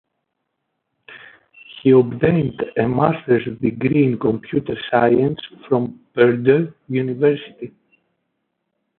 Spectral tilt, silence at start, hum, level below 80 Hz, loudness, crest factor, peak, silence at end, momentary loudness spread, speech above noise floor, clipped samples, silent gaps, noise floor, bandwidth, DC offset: -12.5 dB/octave; 1.1 s; none; -52 dBFS; -18 LUFS; 18 dB; -2 dBFS; 1.3 s; 9 LU; 58 dB; under 0.1%; none; -75 dBFS; 4.3 kHz; under 0.1%